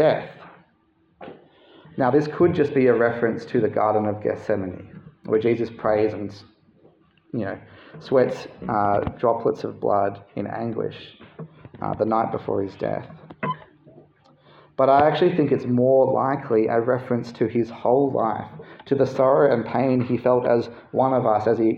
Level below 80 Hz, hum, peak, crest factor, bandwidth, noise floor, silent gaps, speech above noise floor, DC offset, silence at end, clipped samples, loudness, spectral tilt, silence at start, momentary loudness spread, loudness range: -58 dBFS; none; -4 dBFS; 18 dB; 7.2 kHz; -63 dBFS; none; 42 dB; under 0.1%; 0 s; under 0.1%; -22 LUFS; -8.5 dB/octave; 0 s; 18 LU; 6 LU